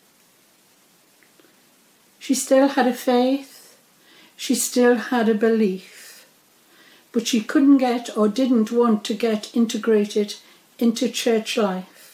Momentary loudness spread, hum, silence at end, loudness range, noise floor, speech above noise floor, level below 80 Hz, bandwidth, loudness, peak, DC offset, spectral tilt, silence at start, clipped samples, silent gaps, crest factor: 11 LU; none; 0.3 s; 3 LU; -57 dBFS; 38 dB; -84 dBFS; 18.5 kHz; -20 LUFS; -6 dBFS; under 0.1%; -4 dB/octave; 2.2 s; under 0.1%; none; 16 dB